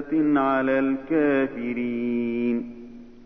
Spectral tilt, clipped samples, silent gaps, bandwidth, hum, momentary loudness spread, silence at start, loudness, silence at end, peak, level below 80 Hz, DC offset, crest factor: -9 dB/octave; under 0.1%; none; 5.6 kHz; none; 11 LU; 0 s; -24 LUFS; 0 s; -12 dBFS; -56 dBFS; under 0.1%; 12 dB